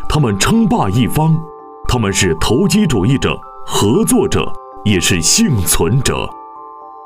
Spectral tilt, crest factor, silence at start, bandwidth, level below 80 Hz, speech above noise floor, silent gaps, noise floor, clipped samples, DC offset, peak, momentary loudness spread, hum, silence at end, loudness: -4.5 dB/octave; 12 dB; 0 s; 16 kHz; -28 dBFS; 20 dB; none; -33 dBFS; under 0.1%; under 0.1%; -2 dBFS; 14 LU; none; 0 s; -14 LUFS